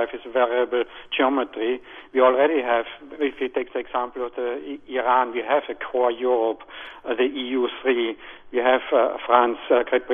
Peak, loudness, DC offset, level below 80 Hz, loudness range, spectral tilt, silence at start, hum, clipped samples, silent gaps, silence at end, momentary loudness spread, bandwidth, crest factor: -2 dBFS; -23 LUFS; under 0.1%; -60 dBFS; 2 LU; -6.5 dB/octave; 0 s; none; under 0.1%; none; 0 s; 10 LU; 3.7 kHz; 20 dB